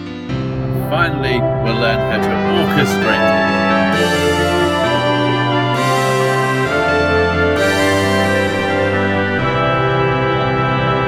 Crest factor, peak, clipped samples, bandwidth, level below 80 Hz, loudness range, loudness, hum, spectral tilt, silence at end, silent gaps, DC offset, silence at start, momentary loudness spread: 14 dB; 0 dBFS; under 0.1%; 16.5 kHz; -38 dBFS; 1 LU; -15 LUFS; none; -5.5 dB/octave; 0 s; none; under 0.1%; 0 s; 3 LU